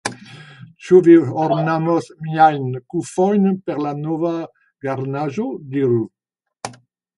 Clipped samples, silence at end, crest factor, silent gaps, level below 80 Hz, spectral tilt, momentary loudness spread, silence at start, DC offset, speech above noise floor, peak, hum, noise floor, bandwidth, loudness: under 0.1%; 0.45 s; 18 dB; none; -64 dBFS; -7.5 dB/octave; 21 LU; 0.05 s; under 0.1%; 26 dB; 0 dBFS; none; -43 dBFS; 11.5 kHz; -18 LUFS